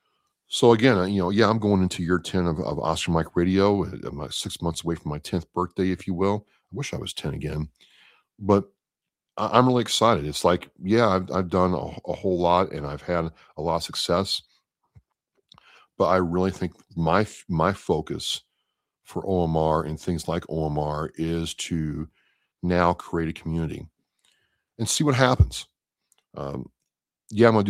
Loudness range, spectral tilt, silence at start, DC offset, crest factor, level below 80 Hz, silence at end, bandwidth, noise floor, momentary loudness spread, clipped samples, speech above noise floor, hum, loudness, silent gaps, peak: 6 LU; -5.5 dB/octave; 0.5 s; under 0.1%; 24 dB; -44 dBFS; 0 s; 16 kHz; -88 dBFS; 13 LU; under 0.1%; 65 dB; none; -24 LUFS; none; -2 dBFS